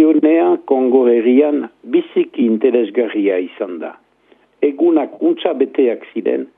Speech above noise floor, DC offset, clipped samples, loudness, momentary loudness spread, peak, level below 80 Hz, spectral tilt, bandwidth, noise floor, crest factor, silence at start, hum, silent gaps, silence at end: 39 dB; under 0.1%; under 0.1%; -15 LUFS; 9 LU; 0 dBFS; -76 dBFS; -9.5 dB/octave; 3.8 kHz; -53 dBFS; 14 dB; 0 s; none; none; 0.1 s